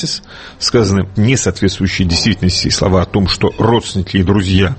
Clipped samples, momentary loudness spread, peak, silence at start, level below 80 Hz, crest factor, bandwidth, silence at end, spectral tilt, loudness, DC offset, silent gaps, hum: under 0.1%; 4 LU; 0 dBFS; 0 s; -30 dBFS; 14 dB; 8.8 kHz; 0 s; -5 dB/octave; -13 LUFS; under 0.1%; none; none